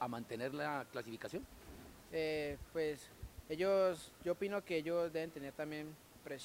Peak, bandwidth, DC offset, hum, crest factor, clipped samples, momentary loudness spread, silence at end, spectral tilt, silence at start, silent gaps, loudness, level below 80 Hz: -24 dBFS; 16 kHz; under 0.1%; none; 16 dB; under 0.1%; 18 LU; 0 s; -5.5 dB/octave; 0 s; none; -41 LUFS; -64 dBFS